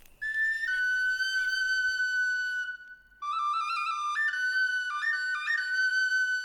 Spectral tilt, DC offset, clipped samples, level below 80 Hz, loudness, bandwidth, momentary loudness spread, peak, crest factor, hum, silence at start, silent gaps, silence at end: 4 dB/octave; under 0.1%; under 0.1%; -66 dBFS; -28 LUFS; 17.5 kHz; 6 LU; -20 dBFS; 10 dB; none; 0.2 s; none; 0 s